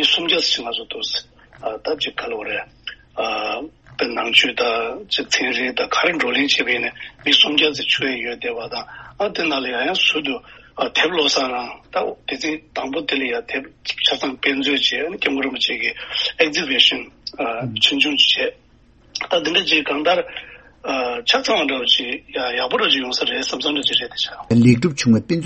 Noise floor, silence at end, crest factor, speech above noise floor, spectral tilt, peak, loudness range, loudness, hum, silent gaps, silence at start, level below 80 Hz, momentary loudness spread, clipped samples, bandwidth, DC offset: -52 dBFS; 0 s; 20 dB; 32 dB; -3.5 dB/octave; 0 dBFS; 4 LU; -18 LUFS; none; none; 0 s; -54 dBFS; 12 LU; under 0.1%; 8.4 kHz; under 0.1%